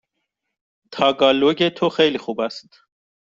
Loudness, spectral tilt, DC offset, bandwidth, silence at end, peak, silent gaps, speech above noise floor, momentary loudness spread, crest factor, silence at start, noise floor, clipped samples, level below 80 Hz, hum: -19 LUFS; -5.5 dB/octave; under 0.1%; 7.6 kHz; 0.75 s; 0 dBFS; none; 59 dB; 13 LU; 20 dB; 0.9 s; -77 dBFS; under 0.1%; -62 dBFS; none